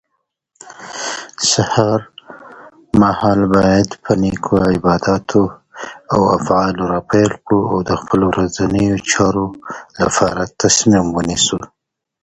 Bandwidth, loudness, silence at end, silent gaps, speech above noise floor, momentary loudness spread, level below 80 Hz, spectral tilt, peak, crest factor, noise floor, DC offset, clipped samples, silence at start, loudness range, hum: 9.6 kHz; -15 LUFS; 0.6 s; none; 57 dB; 11 LU; -40 dBFS; -4.5 dB/octave; 0 dBFS; 16 dB; -72 dBFS; under 0.1%; under 0.1%; 0.65 s; 2 LU; none